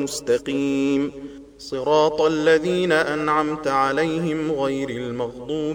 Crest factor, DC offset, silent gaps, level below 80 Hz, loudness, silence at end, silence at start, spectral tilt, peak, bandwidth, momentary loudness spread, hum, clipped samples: 16 dB; under 0.1%; none; -54 dBFS; -21 LUFS; 0 s; 0 s; -5 dB/octave; -6 dBFS; 17 kHz; 10 LU; none; under 0.1%